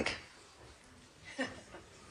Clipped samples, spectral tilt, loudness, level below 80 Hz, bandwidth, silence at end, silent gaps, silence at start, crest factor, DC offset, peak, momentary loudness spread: under 0.1%; -3 dB/octave; -44 LUFS; -64 dBFS; 13 kHz; 0 s; none; 0 s; 26 dB; under 0.1%; -20 dBFS; 16 LU